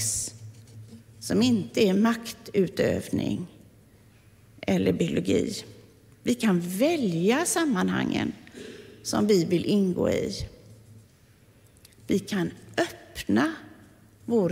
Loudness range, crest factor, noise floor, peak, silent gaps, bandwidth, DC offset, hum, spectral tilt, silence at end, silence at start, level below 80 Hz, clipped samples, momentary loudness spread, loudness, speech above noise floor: 5 LU; 16 dB; -57 dBFS; -10 dBFS; none; 16 kHz; under 0.1%; none; -5 dB/octave; 0 s; 0 s; -54 dBFS; under 0.1%; 19 LU; -26 LUFS; 32 dB